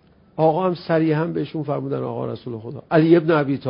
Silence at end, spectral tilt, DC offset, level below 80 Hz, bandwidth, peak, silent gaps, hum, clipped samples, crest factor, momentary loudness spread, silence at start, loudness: 0 s; -12.5 dB/octave; under 0.1%; -60 dBFS; 5.4 kHz; -2 dBFS; none; none; under 0.1%; 18 dB; 15 LU; 0.35 s; -20 LUFS